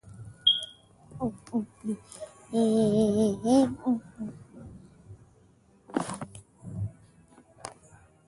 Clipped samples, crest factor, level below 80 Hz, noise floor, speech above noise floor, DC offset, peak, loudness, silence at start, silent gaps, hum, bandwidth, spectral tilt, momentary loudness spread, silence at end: under 0.1%; 20 dB; -58 dBFS; -61 dBFS; 34 dB; under 0.1%; -10 dBFS; -28 LUFS; 0.05 s; none; none; 11.5 kHz; -5.5 dB/octave; 23 LU; 0.55 s